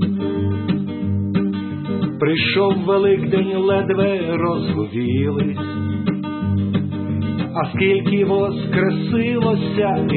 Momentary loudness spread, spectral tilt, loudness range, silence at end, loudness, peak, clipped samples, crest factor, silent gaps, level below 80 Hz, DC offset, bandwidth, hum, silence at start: 6 LU; -12.5 dB/octave; 3 LU; 0 s; -19 LUFS; -4 dBFS; under 0.1%; 14 dB; none; -52 dBFS; under 0.1%; 4.4 kHz; none; 0 s